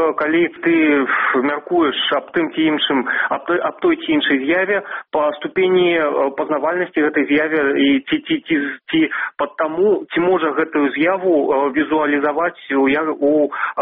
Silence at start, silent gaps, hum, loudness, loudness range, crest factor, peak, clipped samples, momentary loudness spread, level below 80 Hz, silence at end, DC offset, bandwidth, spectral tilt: 0 s; none; none; -17 LUFS; 1 LU; 14 dB; -4 dBFS; under 0.1%; 5 LU; -58 dBFS; 0 s; under 0.1%; 4 kHz; -2 dB/octave